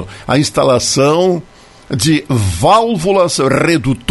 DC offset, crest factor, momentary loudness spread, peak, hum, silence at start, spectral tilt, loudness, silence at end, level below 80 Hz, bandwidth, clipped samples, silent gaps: under 0.1%; 12 dB; 6 LU; 0 dBFS; none; 0 s; -5 dB/octave; -12 LUFS; 0.05 s; -38 dBFS; 12 kHz; under 0.1%; none